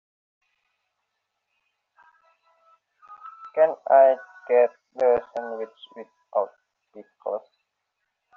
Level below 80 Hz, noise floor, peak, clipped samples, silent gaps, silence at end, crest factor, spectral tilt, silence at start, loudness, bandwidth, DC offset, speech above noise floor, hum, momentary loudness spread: -72 dBFS; -79 dBFS; -6 dBFS; under 0.1%; none; 0.95 s; 20 dB; -2 dB/octave; 3.1 s; -23 LUFS; 4.2 kHz; under 0.1%; 57 dB; none; 26 LU